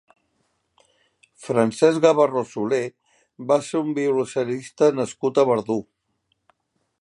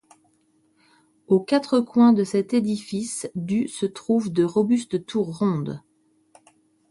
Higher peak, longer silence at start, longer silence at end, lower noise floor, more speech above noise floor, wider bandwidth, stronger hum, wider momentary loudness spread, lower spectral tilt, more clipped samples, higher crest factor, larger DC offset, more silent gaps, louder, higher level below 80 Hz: about the same, -4 dBFS vs -6 dBFS; about the same, 1.4 s vs 1.3 s; about the same, 1.2 s vs 1.1 s; first, -72 dBFS vs -64 dBFS; first, 51 dB vs 42 dB; about the same, 11.5 kHz vs 11.5 kHz; neither; about the same, 11 LU vs 11 LU; about the same, -5.5 dB/octave vs -6.5 dB/octave; neither; about the same, 20 dB vs 16 dB; neither; neither; about the same, -21 LUFS vs -23 LUFS; about the same, -70 dBFS vs -66 dBFS